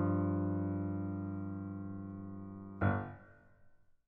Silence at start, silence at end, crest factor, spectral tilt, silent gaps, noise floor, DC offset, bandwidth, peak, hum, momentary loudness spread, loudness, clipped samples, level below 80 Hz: 0 s; 0.15 s; 18 dB; -9.5 dB/octave; none; -63 dBFS; under 0.1%; 3.6 kHz; -20 dBFS; none; 13 LU; -39 LUFS; under 0.1%; -64 dBFS